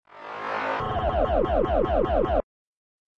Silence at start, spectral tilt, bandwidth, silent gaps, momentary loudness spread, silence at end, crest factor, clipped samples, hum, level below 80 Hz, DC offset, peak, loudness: 0.15 s; -8 dB/octave; 7.4 kHz; none; 7 LU; 0.8 s; 14 dB; under 0.1%; none; -34 dBFS; under 0.1%; -10 dBFS; -25 LUFS